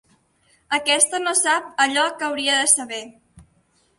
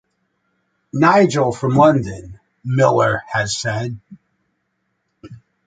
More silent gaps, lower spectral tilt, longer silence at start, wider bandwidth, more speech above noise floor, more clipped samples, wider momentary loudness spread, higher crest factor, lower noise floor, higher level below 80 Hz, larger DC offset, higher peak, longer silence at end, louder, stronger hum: neither; second, 1 dB/octave vs -6 dB/octave; second, 0.7 s vs 0.95 s; first, 12 kHz vs 9.4 kHz; second, 42 dB vs 55 dB; neither; second, 8 LU vs 17 LU; about the same, 20 dB vs 18 dB; second, -62 dBFS vs -71 dBFS; second, -64 dBFS vs -50 dBFS; neither; about the same, -2 dBFS vs -2 dBFS; first, 0.55 s vs 0.3 s; about the same, -18 LUFS vs -16 LUFS; neither